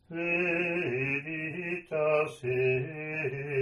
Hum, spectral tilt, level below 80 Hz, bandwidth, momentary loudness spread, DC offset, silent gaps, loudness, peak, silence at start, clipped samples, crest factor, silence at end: none; -7.5 dB/octave; -66 dBFS; 11.5 kHz; 7 LU; under 0.1%; none; -30 LUFS; -16 dBFS; 0.1 s; under 0.1%; 16 dB; 0 s